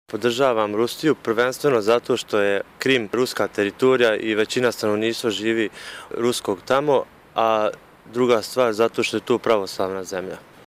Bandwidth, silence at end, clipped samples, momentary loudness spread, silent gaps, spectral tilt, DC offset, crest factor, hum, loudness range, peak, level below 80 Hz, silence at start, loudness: 16 kHz; 0.3 s; under 0.1%; 7 LU; none; -4.5 dB/octave; under 0.1%; 16 dB; none; 2 LU; -6 dBFS; -64 dBFS; 0.1 s; -21 LUFS